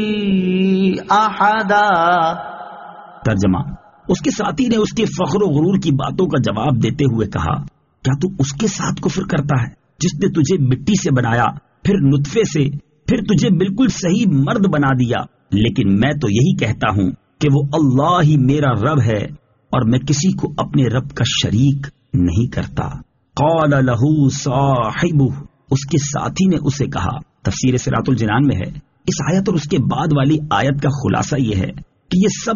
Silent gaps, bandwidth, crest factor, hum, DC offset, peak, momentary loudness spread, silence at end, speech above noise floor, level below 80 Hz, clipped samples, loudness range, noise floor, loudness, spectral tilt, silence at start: none; 7.4 kHz; 14 dB; none; under 0.1%; -2 dBFS; 8 LU; 0 s; 20 dB; -40 dBFS; under 0.1%; 3 LU; -36 dBFS; -17 LUFS; -6 dB/octave; 0 s